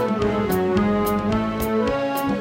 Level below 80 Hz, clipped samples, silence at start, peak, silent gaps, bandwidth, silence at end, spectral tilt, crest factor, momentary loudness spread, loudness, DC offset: -38 dBFS; under 0.1%; 0 s; -8 dBFS; none; 16.5 kHz; 0 s; -6.5 dB/octave; 14 dB; 3 LU; -21 LUFS; under 0.1%